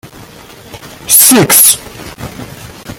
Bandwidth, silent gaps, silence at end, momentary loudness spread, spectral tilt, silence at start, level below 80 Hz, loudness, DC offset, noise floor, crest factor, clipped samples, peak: over 20 kHz; none; 0.05 s; 25 LU; -2 dB/octave; 0.05 s; -42 dBFS; -4 LUFS; under 0.1%; -34 dBFS; 12 dB; 1%; 0 dBFS